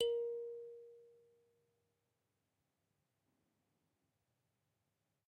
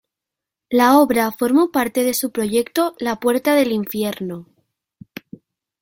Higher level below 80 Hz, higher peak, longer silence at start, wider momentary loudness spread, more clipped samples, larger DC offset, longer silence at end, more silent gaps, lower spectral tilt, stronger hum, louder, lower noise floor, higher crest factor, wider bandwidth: second, -90 dBFS vs -60 dBFS; second, -24 dBFS vs -2 dBFS; second, 0 s vs 0.7 s; about the same, 22 LU vs 20 LU; neither; neither; first, 4.15 s vs 1.4 s; neither; second, -0.5 dB/octave vs -4 dB/octave; neither; second, -44 LUFS vs -18 LUFS; about the same, -87 dBFS vs -85 dBFS; first, 24 dB vs 18 dB; second, 8 kHz vs 17 kHz